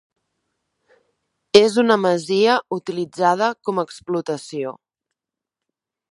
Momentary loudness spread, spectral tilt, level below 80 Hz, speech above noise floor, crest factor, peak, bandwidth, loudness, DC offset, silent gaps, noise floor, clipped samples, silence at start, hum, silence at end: 13 LU; -4.5 dB/octave; -66 dBFS; 66 dB; 22 dB; 0 dBFS; 11.5 kHz; -19 LUFS; under 0.1%; none; -85 dBFS; under 0.1%; 1.55 s; none; 1.4 s